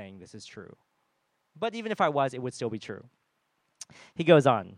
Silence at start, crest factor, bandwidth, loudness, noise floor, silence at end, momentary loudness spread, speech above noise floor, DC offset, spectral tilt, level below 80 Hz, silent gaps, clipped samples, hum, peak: 0 s; 24 dB; 11 kHz; -26 LUFS; -76 dBFS; 0 s; 26 LU; 48 dB; under 0.1%; -6 dB/octave; -76 dBFS; none; under 0.1%; none; -6 dBFS